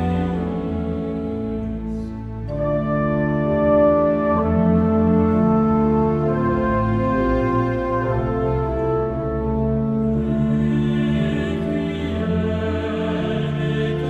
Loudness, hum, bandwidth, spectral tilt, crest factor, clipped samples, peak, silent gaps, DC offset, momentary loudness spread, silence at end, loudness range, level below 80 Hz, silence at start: -20 LUFS; none; 7.8 kHz; -9.5 dB/octave; 14 dB; under 0.1%; -6 dBFS; none; under 0.1%; 8 LU; 0 s; 4 LU; -34 dBFS; 0 s